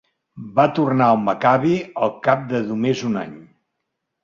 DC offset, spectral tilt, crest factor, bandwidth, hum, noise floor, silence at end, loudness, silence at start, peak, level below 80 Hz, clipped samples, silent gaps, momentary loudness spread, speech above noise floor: under 0.1%; -7 dB/octave; 18 dB; 7.4 kHz; none; -77 dBFS; 0.8 s; -19 LUFS; 0.35 s; -2 dBFS; -60 dBFS; under 0.1%; none; 9 LU; 59 dB